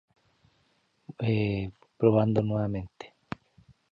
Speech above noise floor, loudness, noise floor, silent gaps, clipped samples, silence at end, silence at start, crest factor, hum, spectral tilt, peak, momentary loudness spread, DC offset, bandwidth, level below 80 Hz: 44 dB; -28 LUFS; -70 dBFS; none; under 0.1%; 0.85 s; 1.2 s; 22 dB; none; -9.5 dB/octave; -8 dBFS; 20 LU; under 0.1%; 7 kHz; -54 dBFS